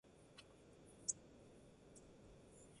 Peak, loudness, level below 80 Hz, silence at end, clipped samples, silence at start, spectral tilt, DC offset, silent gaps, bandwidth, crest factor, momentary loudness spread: -24 dBFS; -50 LUFS; -76 dBFS; 0 s; under 0.1%; 0.05 s; -2 dB/octave; under 0.1%; none; 11.5 kHz; 32 dB; 19 LU